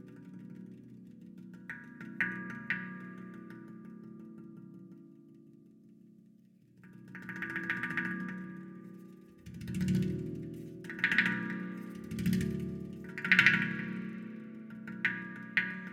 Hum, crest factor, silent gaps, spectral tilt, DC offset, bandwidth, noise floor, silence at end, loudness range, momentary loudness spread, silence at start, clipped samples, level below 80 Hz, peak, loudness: none; 32 dB; none; -5.5 dB/octave; under 0.1%; 16 kHz; -62 dBFS; 0 s; 20 LU; 22 LU; 0 s; under 0.1%; -62 dBFS; -6 dBFS; -33 LUFS